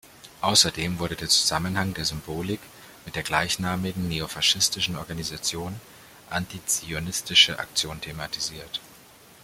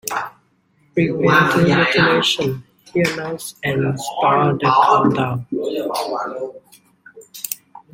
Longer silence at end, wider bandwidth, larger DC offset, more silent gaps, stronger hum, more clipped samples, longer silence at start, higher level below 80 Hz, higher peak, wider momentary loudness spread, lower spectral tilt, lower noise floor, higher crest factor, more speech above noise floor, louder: first, 0.45 s vs 0.15 s; about the same, 16.5 kHz vs 16.5 kHz; neither; neither; neither; neither; about the same, 0.05 s vs 0.05 s; about the same, -52 dBFS vs -54 dBFS; about the same, -2 dBFS vs 0 dBFS; about the same, 15 LU vs 15 LU; second, -2 dB/octave vs -5 dB/octave; second, -51 dBFS vs -59 dBFS; first, 24 dB vs 18 dB; second, 25 dB vs 42 dB; second, -24 LUFS vs -17 LUFS